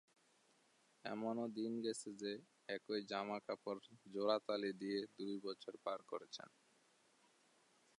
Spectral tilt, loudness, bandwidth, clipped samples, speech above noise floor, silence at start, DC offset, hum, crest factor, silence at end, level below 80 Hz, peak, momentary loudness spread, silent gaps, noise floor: -4.5 dB/octave; -45 LUFS; 11 kHz; under 0.1%; 31 dB; 1.05 s; under 0.1%; none; 22 dB; 1.5 s; under -90 dBFS; -24 dBFS; 11 LU; none; -76 dBFS